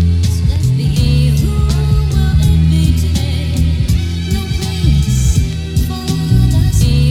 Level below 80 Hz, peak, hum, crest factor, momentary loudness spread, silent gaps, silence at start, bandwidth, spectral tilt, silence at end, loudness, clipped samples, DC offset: -16 dBFS; -2 dBFS; none; 10 dB; 6 LU; none; 0 s; 15.5 kHz; -6 dB/octave; 0 s; -14 LUFS; under 0.1%; under 0.1%